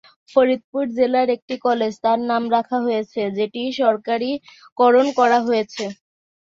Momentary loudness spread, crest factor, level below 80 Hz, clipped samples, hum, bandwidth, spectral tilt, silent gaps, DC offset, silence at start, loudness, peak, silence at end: 9 LU; 18 dB; -66 dBFS; under 0.1%; none; 7.6 kHz; -5 dB/octave; 0.64-0.73 s, 1.42-1.48 s, 4.72-4.76 s; under 0.1%; 0.35 s; -20 LUFS; -2 dBFS; 0.65 s